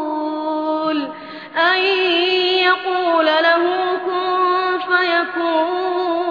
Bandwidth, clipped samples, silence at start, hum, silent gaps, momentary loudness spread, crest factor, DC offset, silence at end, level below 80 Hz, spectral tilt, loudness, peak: 5.2 kHz; under 0.1%; 0 s; none; none; 8 LU; 14 dB; under 0.1%; 0 s; -74 dBFS; -4 dB/octave; -17 LUFS; -2 dBFS